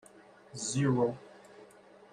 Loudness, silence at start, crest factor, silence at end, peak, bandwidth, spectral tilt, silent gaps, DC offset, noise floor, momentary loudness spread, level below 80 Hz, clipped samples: -31 LUFS; 0.55 s; 18 dB; 0.45 s; -18 dBFS; 11.5 kHz; -5.5 dB/octave; none; under 0.1%; -57 dBFS; 25 LU; -70 dBFS; under 0.1%